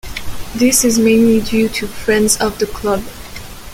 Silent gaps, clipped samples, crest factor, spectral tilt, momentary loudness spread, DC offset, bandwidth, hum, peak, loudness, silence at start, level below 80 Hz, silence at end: none; under 0.1%; 14 dB; -3.5 dB/octave; 19 LU; under 0.1%; 17 kHz; none; 0 dBFS; -14 LUFS; 0.05 s; -34 dBFS; 0 s